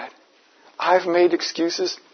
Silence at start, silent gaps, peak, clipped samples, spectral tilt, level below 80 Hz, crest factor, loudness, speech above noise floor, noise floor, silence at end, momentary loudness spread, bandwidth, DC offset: 0 s; none; -4 dBFS; under 0.1%; -3 dB/octave; -78 dBFS; 18 dB; -20 LUFS; 35 dB; -56 dBFS; 0.2 s; 8 LU; 6.6 kHz; under 0.1%